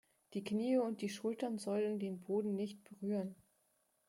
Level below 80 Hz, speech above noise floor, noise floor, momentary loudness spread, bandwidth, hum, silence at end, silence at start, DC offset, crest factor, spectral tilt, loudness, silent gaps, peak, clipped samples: -84 dBFS; 40 dB; -79 dBFS; 10 LU; 16 kHz; none; 0.75 s; 0.3 s; under 0.1%; 16 dB; -6.5 dB/octave; -40 LUFS; none; -24 dBFS; under 0.1%